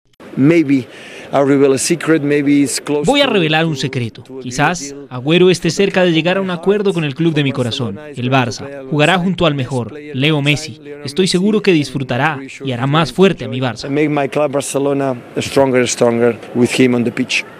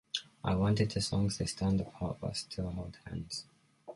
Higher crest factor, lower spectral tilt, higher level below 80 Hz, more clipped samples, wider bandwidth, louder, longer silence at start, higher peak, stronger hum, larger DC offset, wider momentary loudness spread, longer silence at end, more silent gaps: about the same, 14 dB vs 18 dB; about the same, -5 dB/octave vs -5.5 dB/octave; about the same, -48 dBFS vs -50 dBFS; neither; first, 14.5 kHz vs 11.5 kHz; first, -15 LUFS vs -35 LUFS; about the same, 0.2 s vs 0.15 s; first, 0 dBFS vs -16 dBFS; neither; neither; about the same, 11 LU vs 13 LU; about the same, 0 s vs 0 s; neither